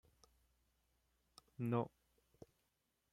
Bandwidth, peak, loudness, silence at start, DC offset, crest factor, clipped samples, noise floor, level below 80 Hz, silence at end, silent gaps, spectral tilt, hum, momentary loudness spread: 14.5 kHz; -26 dBFS; -43 LUFS; 1.6 s; under 0.1%; 24 dB; under 0.1%; -85 dBFS; -80 dBFS; 1.25 s; none; -8.5 dB/octave; none; 25 LU